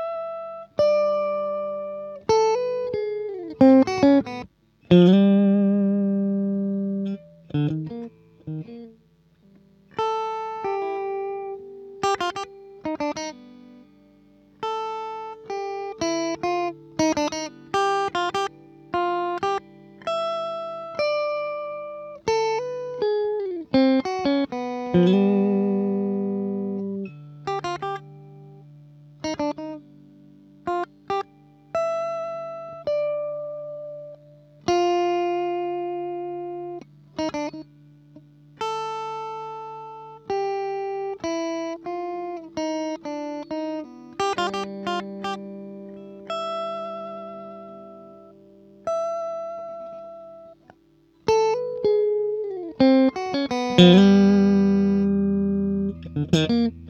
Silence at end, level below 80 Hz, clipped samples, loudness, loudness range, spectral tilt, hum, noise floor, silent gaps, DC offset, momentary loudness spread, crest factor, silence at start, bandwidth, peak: 0 s; -58 dBFS; under 0.1%; -24 LUFS; 14 LU; -6.5 dB/octave; 50 Hz at -45 dBFS; -59 dBFS; none; under 0.1%; 18 LU; 24 dB; 0 s; 8.4 kHz; 0 dBFS